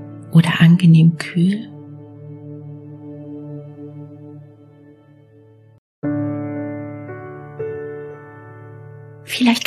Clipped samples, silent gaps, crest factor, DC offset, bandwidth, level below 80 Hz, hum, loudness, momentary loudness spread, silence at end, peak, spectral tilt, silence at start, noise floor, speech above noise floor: under 0.1%; 5.78-6.02 s; 18 dB; under 0.1%; 13 kHz; -64 dBFS; none; -17 LUFS; 26 LU; 0 s; -2 dBFS; -7 dB/octave; 0 s; -48 dBFS; 35 dB